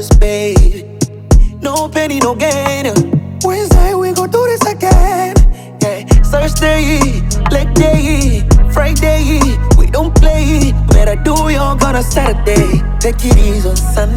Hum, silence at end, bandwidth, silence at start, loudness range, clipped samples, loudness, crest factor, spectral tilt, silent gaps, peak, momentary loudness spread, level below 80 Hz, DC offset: none; 0 s; 16.5 kHz; 0 s; 2 LU; 0.1%; -12 LUFS; 10 dB; -5.5 dB/octave; none; 0 dBFS; 5 LU; -12 dBFS; under 0.1%